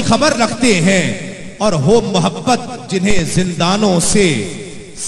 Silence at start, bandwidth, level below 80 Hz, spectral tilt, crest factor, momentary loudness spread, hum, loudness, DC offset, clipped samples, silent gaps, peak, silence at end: 0 s; 13 kHz; -34 dBFS; -4.5 dB/octave; 14 dB; 11 LU; none; -14 LUFS; under 0.1%; under 0.1%; none; 0 dBFS; 0 s